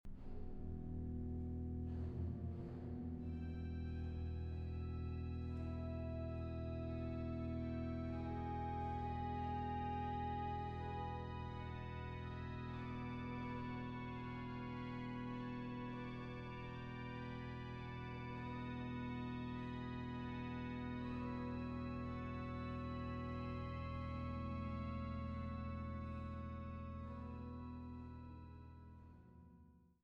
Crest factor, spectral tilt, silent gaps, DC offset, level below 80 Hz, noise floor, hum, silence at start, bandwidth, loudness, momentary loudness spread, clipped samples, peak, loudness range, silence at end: 14 dB; -9 dB/octave; none; under 0.1%; -54 dBFS; -66 dBFS; none; 0.05 s; 6.2 kHz; -47 LUFS; 6 LU; under 0.1%; -32 dBFS; 4 LU; 0.15 s